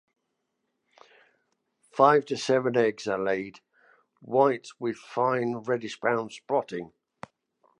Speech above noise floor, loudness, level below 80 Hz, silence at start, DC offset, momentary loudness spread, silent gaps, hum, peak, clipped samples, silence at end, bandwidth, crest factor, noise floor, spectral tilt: 54 dB; -26 LUFS; -74 dBFS; 1.95 s; under 0.1%; 19 LU; none; none; -6 dBFS; under 0.1%; 0.95 s; 10.5 kHz; 22 dB; -80 dBFS; -5.5 dB/octave